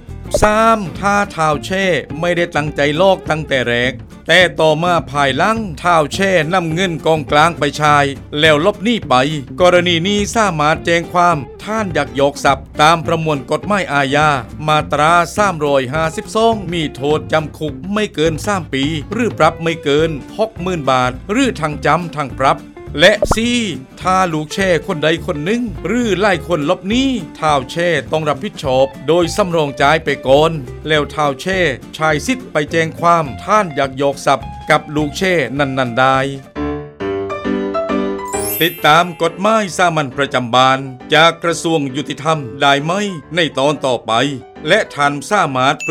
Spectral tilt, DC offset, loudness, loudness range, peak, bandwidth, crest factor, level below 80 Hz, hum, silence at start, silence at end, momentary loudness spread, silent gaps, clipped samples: -4.5 dB/octave; under 0.1%; -15 LUFS; 3 LU; 0 dBFS; 16.5 kHz; 14 dB; -36 dBFS; none; 0 s; 0 s; 7 LU; none; under 0.1%